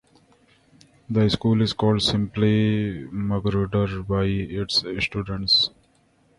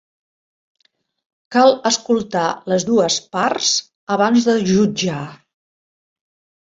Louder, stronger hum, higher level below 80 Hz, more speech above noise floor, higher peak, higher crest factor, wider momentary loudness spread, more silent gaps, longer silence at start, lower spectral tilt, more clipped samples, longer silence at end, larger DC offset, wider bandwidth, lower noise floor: second, -22 LUFS vs -17 LUFS; neither; first, -44 dBFS vs -58 dBFS; second, 39 dB vs over 74 dB; second, -6 dBFS vs -2 dBFS; about the same, 16 dB vs 18 dB; about the same, 8 LU vs 8 LU; second, none vs 3.95-4.07 s; second, 1.1 s vs 1.5 s; first, -6 dB/octave vs -4 dB/octave; neither; second, 0.7 s vs 1.3 s; neither; first, 11.5 kHz vs 7.8 kHz; second, -61 dBFS vs under -90 dBFS